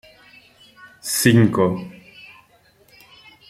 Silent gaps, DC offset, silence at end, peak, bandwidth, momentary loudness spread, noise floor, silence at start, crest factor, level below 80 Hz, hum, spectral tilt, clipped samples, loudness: none; under 0.1%; 1.6 s; 0 dBFS; 16 kHz; 26 LU; -56 dBFS; 1.05 s; 22 dB; -56 dBFS; none; -5 dB/octave; under 0.1%; -18 LUFS